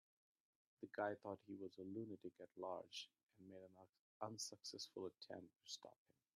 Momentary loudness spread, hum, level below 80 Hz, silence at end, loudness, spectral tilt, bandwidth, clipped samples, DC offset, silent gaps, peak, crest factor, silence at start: 15 LU; none; under -90 dBFS; 0.45 s; -53 LUFS; -3.5 dB/octave; 13.5 kHz; under 0.1%; under 0.1%; 3.89-3.93 s, 3.99-4.20 s; -30 dBFS; 24 dB; 0.8 s